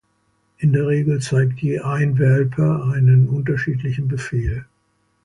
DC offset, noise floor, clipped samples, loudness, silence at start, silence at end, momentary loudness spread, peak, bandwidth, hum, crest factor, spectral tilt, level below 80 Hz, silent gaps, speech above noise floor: under 0.1%; -65 dBFS; under 0.1%; -19 LUFS; 0.6 s; 0.6 s; 8 LU; -6 dBFS; 11 kHz; none; 12 dB; -8 dB/octave; -40 dBFS; none; 48 dB